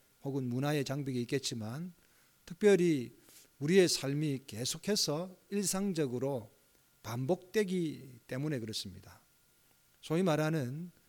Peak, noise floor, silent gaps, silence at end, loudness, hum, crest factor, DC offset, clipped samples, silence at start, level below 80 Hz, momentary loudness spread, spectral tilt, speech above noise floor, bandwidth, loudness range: -14 dBFS; -68 dBFS; none; 0.2 s; -34 LUFS; none; 20 dB; under 0.1%; under 0.1%; 0.25 s; -70 dBFS; 15 LU; -5 dB/octave; 35 dB; 19 kHz; 6 LU